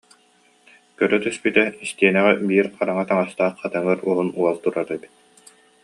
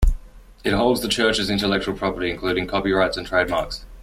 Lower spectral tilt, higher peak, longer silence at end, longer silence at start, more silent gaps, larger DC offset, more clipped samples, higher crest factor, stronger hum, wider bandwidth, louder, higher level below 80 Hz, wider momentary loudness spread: about the same, -5.5 dB/octave vs -4.5 dB/octave; about the same, -2 dBFS vs -4 dBFS; first, 0.85 s vs 0 s; first, 1 s vs 0 s; neither; neither; neither; about the same, 20 dB vs 16 dB; neither; second, 11.5 kHz vs 16 kHz; about the same, -20 LUFS vs -22 LUFS; second, -68 dBFS vs -28 dBFS; about the same, 7 LU vs 6 LU